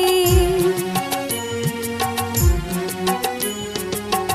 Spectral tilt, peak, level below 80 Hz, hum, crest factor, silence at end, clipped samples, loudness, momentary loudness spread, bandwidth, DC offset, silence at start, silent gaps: -4.5 dB/octave; -4 dBFS; -28 dBFS; none; 16 dB; 0 s; under 0.1%; -21 LUFS; 8 LU; 15.5 kHz; under 0.1%; 0 s; none